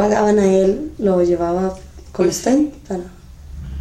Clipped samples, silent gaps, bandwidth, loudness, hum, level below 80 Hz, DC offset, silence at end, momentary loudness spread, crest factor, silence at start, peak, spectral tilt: under 0.1%; none; 14 kHz; -17 LUFS; none; -38 dBFS; under 0.1%; 0 s; 20 LU; 14 dB; 0 s; -2 dBFS; -6 dB/octave